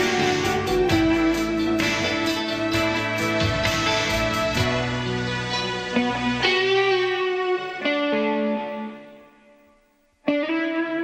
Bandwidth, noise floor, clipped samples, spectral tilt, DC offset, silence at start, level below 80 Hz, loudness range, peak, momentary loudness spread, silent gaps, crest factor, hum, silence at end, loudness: 15.5 kHz; -61 dBFS; under 0.1%; -4.5 dB/octave; under 0.1%; 0 s; -44 dBFS; 5 LU; -8 dBFS; 6 LU; none; 16 dB; none; 0 s; -22 LUFS